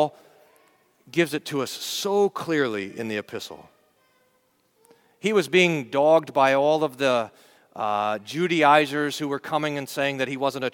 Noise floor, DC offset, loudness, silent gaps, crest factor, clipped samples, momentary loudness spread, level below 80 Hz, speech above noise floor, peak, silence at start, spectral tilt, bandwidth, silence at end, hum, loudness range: -66 dBFS; under 0.1%; -23 LUFS; none; 22 dB; under 0.1%; 11 LU; -74 dBFS; 43 dB; -4 dBFS; 0 s; -4.5 dB/octave; 19 kHz; 0.05 s; none; 6 LU